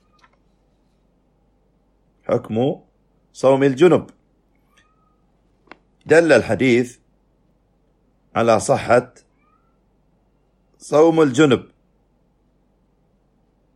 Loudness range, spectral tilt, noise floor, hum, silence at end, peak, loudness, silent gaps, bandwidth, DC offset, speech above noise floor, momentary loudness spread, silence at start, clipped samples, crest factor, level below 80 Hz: 4 LU; -6 dB/octave; -61 dBFS; none; 2.15 s; -2 dBFS; -17 LUFS; none; 12 kHz; under 0.1%; 46 dB; 10 LU; 2.3 s; under 0.1%; 20 dB; -58 dBFS